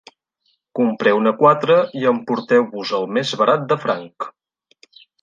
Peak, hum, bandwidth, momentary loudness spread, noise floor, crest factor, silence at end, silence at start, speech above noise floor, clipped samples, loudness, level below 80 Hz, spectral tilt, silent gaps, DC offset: -2 dBFS; none; 7.6 kHz; 12 LU; -67 dBFS; 18 dB; 0.9 s; 0.75 s; 50 dB; under 0.1%; -17 LUFS; -70 dBFS; -6 dB/octave; none; under 0.1%